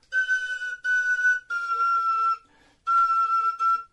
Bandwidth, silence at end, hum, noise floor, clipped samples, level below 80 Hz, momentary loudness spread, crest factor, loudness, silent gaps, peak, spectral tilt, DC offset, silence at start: 10 kHz; 0.05 s; none; -56 dBFS; under 0.1%; -68 dBFS; 7 LU; 10 dB; -23 LUFS; none; -14 dBFS; 2 dB/octave; under 0.1%; 0.1 s